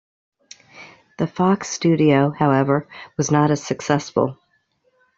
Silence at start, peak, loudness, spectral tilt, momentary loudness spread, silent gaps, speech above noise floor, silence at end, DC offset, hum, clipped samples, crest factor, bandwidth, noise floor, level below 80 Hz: 0.75 s; -2 dBFS; -19 LUFS; -6 dB/octave; 10 LU; none; 46 dB; 0.85 s; under 0.1%; none; under 0.1%; 18 dB; 7.8 kHz; -65 dBFS; -58 dBFS